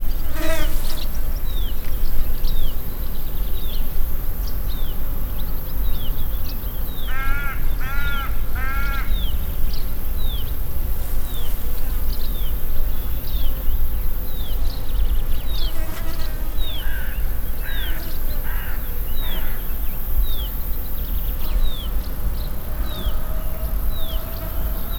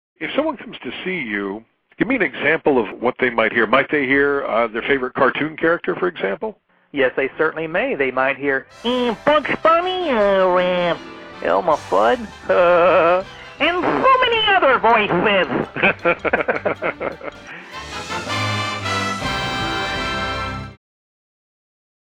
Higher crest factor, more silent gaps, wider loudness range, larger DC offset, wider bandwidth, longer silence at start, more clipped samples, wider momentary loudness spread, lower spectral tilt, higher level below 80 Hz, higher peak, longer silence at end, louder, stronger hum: about the same, 14 dB vs 16 dB; neither; second, 2 LU vs 7 LU; neither; first, 20 kHz vs 12 kHz; second, 0 s vs 0.2 s; neither; second, 4 LU vs 13 LU; about the same, -5 dB/octave vs -5 dB/octave; first, -20 dBFS vs -46 dBFS; about the same, -4 dBFS vs -4 dBFS; second, 0 s vs 1.35 s; second, -27 LUFS vs -18 LUFS; neither